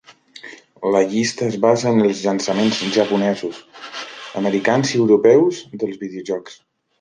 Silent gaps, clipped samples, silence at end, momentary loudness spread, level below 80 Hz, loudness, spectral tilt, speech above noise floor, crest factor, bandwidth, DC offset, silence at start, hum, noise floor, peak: none; under 0.1%; 0.45 s; 17 LU; -62 dBFS; -18 LUFS; -5 dB/octave; 24 dB; 16 dB; 10 kHz; under 0.1%; 0.45 s; none; -41 dBFS; -2 dBFS